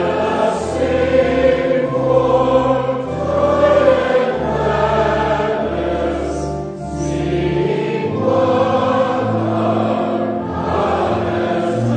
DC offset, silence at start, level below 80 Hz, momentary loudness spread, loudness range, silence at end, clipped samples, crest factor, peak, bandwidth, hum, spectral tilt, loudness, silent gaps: under 0.1%; 0 s; -36 dBFS; 7 LU; 4 LU; 0 s; under 0.1%; 16 dB; 0 dBFS; 9.4 kHz; none; -7 dB/octave; -17 LUFS; none